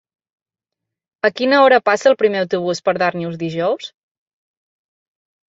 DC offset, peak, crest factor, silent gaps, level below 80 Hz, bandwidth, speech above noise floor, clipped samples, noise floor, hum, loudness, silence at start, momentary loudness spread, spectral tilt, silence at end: under 0.1%; -2 dBFS; 18 dB; none; -66 dBFS; 7.8 kHz; 68 dB; under 0.1%; -84 dBFS; none; -16 LUFS; 1.25 s; 12 LU; -5 dB/octave; 1.6 s